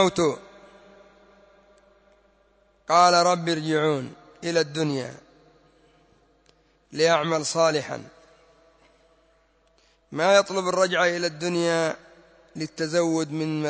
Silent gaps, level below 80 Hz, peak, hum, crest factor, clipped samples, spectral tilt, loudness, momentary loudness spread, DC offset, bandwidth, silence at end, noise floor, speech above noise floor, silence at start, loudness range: none; -66 dBFS; -6 dBFS; none; 20 dB; under 0.1%; -4 dB/octave; -23 LUFS; 18 LU; under 0.1%; 8 kHz; 0 s; -63 dBFS; 40 dB; 0 s; 5 LU